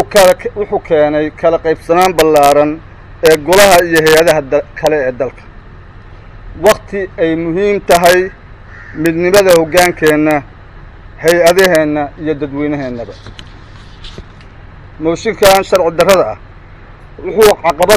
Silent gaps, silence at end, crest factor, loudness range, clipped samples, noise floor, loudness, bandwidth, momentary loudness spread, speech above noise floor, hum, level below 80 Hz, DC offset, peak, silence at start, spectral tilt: none; 0 s; 12 dB; 7 LU; 0.3%; -34 dBFS; -10 LUFS; 16 kHz; 13 LU; 24 dB; none; -36 dBFS; 0.4%; 0 dBFS; 0 s; -4 dB/octave